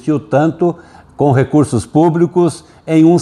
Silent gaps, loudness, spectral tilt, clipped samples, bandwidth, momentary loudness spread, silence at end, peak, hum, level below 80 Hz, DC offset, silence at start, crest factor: none; -13 LUFS; -8 dB/octave; under 0.1%; 11.5 kHz; 6 LU; 0 s; 0 dBFS; none; -48 dBFS; under 0.1%; 0.05 s; 12 dB